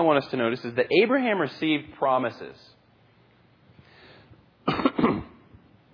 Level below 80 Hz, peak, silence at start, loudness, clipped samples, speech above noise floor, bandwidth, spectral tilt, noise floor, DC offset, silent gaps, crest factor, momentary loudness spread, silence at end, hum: -58 dBFS; -8 dBFS; 0 s; -25 LUFS; under 0.1%; 35 dB; 5.4 kHz; -7.5 dB/octave; -59 dBFS; under 0.1%; none; 20 dB; 12 LU; 0.65 s; none